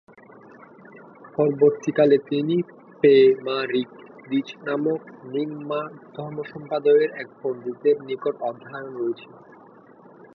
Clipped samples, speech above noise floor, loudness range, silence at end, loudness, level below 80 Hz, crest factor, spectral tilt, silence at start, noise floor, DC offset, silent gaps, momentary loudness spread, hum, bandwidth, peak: under 0.1%; 27 dB; 8 LU; 1.1 s; -23 LUFS; -74 dBFS; 18 dB; -7 dB/octave; 0.95 s; -49 dBFS; under 0.1%; none; 16 LU; none; 6.6 kHz; -6 dBFS